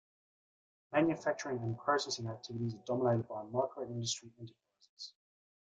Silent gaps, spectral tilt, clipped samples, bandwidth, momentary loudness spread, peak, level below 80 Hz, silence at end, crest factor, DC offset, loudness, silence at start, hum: 4.89-4.97 s; -5 dB/octave; under 0.1%; 9.4 kHz; 17 LU; -16 dBFS; -74 dBFS; 0.65 s; 20 dB; under 0.1%; -36 LUFS; 0.9 s; none